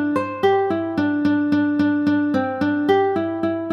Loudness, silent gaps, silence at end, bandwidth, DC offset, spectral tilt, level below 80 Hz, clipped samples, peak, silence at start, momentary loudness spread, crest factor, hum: -20 LUFS; none; 0 s; 6.2 kHz; under 0.1%; -7.5 dB/octave; -60 dBFS; under 0.1%; -4 dBFS; 0 s; 4 LU; 14 dB; none